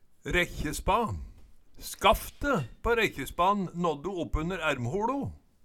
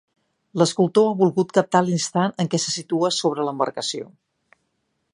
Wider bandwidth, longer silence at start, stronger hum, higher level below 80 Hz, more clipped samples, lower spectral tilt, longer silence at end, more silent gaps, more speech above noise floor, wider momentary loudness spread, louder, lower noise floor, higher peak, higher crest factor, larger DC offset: first, 19 kHz vs 11 kHz; second, 0.25 s vs 0.55 s; neither; first, -42 dBFS vs -72 dBFS; neither; about the same, -4.5 dB/octave vs -5 dB/octave; second, 0.25 s vs 1.05 s; neither; second, 21 dB vs 52 dB; about the same, 9 LU vs 9 LU; second, -29 LUFS vs -21 LUFS; second, -50 dBFS vs -73 dBFS; second, -10 dBFS vs -2 dBFS; about the same, 20 dB vs 20 dB; neither